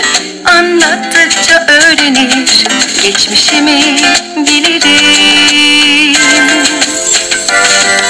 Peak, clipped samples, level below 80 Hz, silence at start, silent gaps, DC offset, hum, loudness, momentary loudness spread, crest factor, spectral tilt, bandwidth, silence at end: 0 dBFS; 0.5%; -44 dBFS; 0 s; none; under 0.1%; none; -5 LUFS; 5 LU; 8 dB; 0 dB/octave; 11 kHz; 0 s